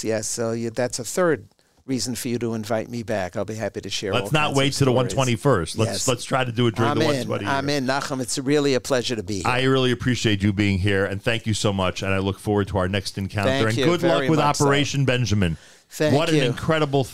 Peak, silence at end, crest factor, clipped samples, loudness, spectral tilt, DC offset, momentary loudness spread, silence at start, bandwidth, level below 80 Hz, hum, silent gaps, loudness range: -6 dBFS; 0 s; 16 dB; under 0.1%; -22 LUFS; -5 dB/octave; 1%; 7 LU; 0 s; 16 kHz; -48 dBFS; none; none; 5 LU